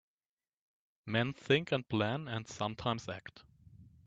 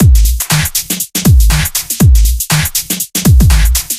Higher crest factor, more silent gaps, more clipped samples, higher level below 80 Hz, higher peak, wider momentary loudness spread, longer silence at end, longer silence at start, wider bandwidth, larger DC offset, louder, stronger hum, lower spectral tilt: first, 22 dB vs 8 dB; neither; neither; second, -68 dBFS vs -12 dBFS; second, -14 dBFS vs 0 dBFS; first, 15 LU vs 6 LU; first, 0.2 s vs 0 s; first, 1.05 s vs 0 s; second, 8 kHz vs 16 kHz; neither; second, -35 LUFS vs -10 LUFS; neither; first, -5.5 dB/octave vs -4 dB/octave